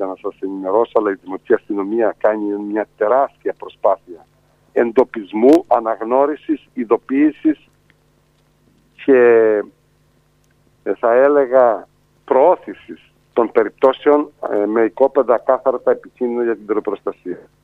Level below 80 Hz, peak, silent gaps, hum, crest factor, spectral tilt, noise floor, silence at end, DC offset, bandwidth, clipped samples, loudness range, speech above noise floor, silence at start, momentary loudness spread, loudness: -64 dBFS; 0 dBFS; none; none; 16 dB; -7 dB/octave; -57 dBFS; 0.25 s; under 0.1%; 7.8 kHz; under 0.1%; 3 LU; 41 dB; 0 s; 13 LU; -17 LUFS